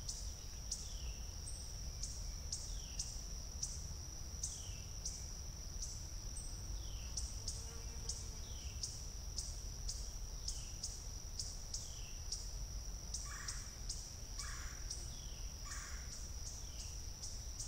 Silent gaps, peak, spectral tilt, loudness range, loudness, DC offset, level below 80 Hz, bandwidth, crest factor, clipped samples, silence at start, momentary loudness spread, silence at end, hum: none; -26 dBFS; -2 dB/octave; 1 LU; -46 LUFS; under 0.1%; -48 dBFS; 16 kHz; 18 dB; under 0.1%; 0 s; 4 LU; 0 s; none